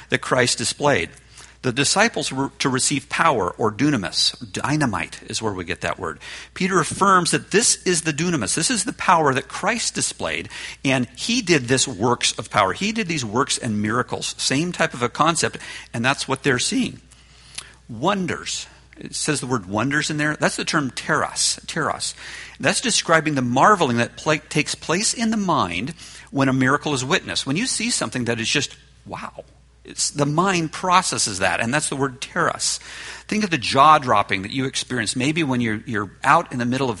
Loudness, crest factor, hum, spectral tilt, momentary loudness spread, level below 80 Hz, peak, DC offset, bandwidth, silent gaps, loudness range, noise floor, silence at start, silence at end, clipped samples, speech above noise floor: -20 LUFS; 22 dB; none; -3.5 dB/octave; 11 LU; -52 dBFS; 0 dBFS; under 0.1%; 11.5 kHz; none; 4 LU; -47 dBFS; 0 s; 0 s; under 0.1%; 26 dB